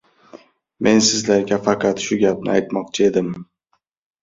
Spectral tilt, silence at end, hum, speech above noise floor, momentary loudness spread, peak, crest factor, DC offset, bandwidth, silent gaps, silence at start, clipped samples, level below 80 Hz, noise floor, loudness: -4 dB/octave; 0.8 s; none; 51 dB; 8 LU; -2 dBFS; 18 dB; under 0.1%; 7.8 kHz; none; 0.35 s; under 0.1%; -56 dBFS; -69 dBFS; -18 LUFS